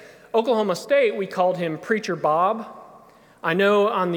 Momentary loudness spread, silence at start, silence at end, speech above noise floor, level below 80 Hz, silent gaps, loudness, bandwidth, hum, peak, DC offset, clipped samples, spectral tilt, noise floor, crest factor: 8 LU; 0 s; 0 s; 29 dB; -72 dBFS; none; -22 LUFS; 18.5 kHz; none; -6 dBFS; under 0.1%; under 0.1%; -5.5 dB/octave; -50 dBFS; 16 dB